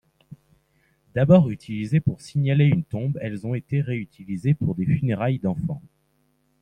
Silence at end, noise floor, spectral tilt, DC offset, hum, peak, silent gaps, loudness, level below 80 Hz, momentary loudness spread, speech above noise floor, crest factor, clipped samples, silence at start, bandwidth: 0.8 s; -67 dBFS; -9 dB/octave; under 0.1%; none; -4 dBFS; none; -23 LUFS; -54 dBFS; 13 LU; 45 dB; 20 dB; under 0.1%; 0.3 s; 9.8 kHz